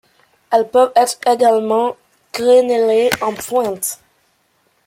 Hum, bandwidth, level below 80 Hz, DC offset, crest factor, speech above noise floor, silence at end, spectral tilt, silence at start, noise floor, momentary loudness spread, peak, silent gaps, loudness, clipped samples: none; 16.5 kHz; -60 dBFS; under 0.1%; 16 dB; 47 dB; 0.9 s; -3 dB/octave; 0.5 s; -61 dBFS; 10 LU; -2 dBFS; none; -15 LUFS; under 0.1%